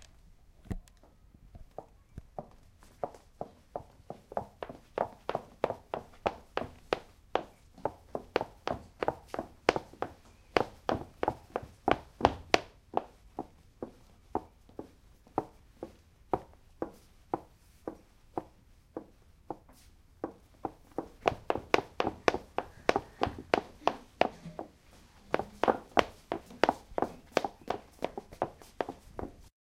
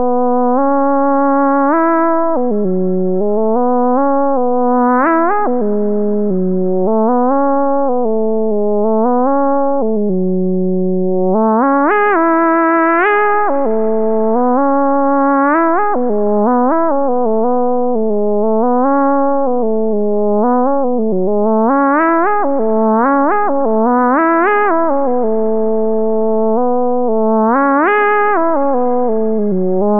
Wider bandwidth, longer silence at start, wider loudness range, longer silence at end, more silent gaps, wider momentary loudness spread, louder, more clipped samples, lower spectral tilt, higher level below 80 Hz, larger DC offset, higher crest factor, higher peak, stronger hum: first, 16 kHz vs 3.5 kHz; about the same, 0 s vs 0 s; first, 12 LU vs 2 LU; first, 0.2 s vs 0 s; neither; first, 17 LU vs 4 LU; second, -36 LUFS vs -13 LUFS; neither; second, -5 dB/octave vs -7.5 dB/octave; first, -56 dBFS vs -64 dBFS; second, under 0.1% vs 9%; first, 36 dB vs 8 dB; first, -2 dBFS vs -6 dBFS; neither